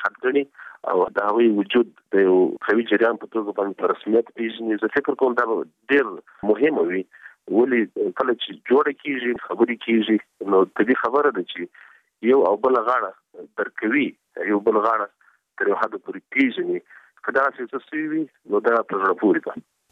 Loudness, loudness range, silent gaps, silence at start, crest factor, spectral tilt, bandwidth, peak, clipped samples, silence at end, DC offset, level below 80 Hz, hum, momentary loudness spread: -22 LUFS; 3 LU; none; 0 s; 16 dB; -7.5 dB/octave; 4.9 kHz; -6 dBFS; under 0.1%; 0.3 s; under 0.1%; -70 dBFS; none; 10 LU